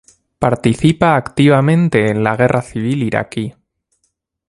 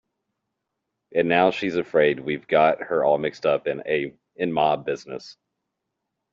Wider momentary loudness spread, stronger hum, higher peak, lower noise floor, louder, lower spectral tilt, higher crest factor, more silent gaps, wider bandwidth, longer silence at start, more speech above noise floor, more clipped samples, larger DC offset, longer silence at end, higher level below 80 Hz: about the same, 8 LU vs 10 LU; neither; first, 0 dBFS vs -6 dBFS; second, -68 dBFS vs -81 dBFS; first, -14 LUFS vs -23 LUFS; first, -7 dB/octave vs -3.5 dB/octave; about the same, 16 dB vs 18 dB; neither; first, 11.5 kHz vs 7.6 kHz; second, 0.4 s vs 1.15 s; second, 54 dB vs 59 dB; neither; neither; about the same, 1 s vs 1 s; first, -44 dBFS vs -66 dBFS